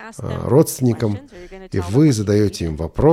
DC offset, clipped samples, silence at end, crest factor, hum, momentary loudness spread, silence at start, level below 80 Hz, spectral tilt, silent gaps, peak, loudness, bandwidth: under 0.1%; under 0.1%; 0 s; 16 dB; none; 13 LU; 0 s; -38 dBFS; -7 dB/octave; none; -2 dBFS; -18 LUFS; 16 kHz